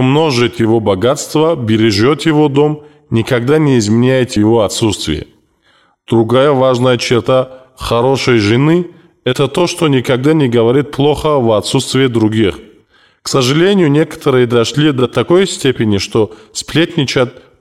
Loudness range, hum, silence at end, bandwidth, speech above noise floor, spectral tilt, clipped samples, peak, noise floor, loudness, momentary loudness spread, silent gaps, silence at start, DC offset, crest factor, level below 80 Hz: 1 LU; none; 0.3 s; 15 kHz; 42 dB; -5.5 dB/octave; under 0.1%; -2 dBFS; -53 dBFS; -12 LUFS; 6 LU; none; 0 s; 0.2%; 10 dB; -42 dBFS